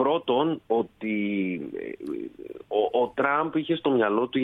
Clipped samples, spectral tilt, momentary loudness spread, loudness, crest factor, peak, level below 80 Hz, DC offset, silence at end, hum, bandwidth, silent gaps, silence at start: under 0.1%; -8 dB/octave; 12 LU; -26 LUFS; 18 dB; -8 dBFS; -66 dBFS; under 0.1%; 0 s; none; 4.1 kHz; none; 0 s